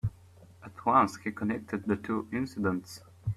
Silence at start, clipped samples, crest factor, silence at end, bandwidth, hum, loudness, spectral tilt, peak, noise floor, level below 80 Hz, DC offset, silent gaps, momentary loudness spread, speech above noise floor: 0.05 s; under 0.1%; 20 dB; 0 s; 14 kHz; none; -31 LUFS; -7 dB/octave; -10 dBFS; -55 dBFS; -56 dBFS; under 0.1%; none; 17 LU; 25 dB